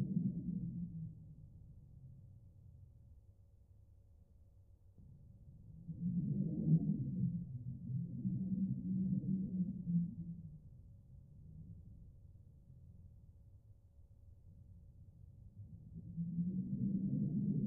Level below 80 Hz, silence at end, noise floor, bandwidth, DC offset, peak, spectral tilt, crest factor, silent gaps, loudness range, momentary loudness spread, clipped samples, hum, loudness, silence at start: -62 dBFS; 0 s; -64 dBFS; 0.9 kHz; under 0.1%; -22 dBFS; -18.5 dB/octave; 20 dB; none; 23 LU; 24 LU; under 0.1%; none; -40 LUFS; 0 s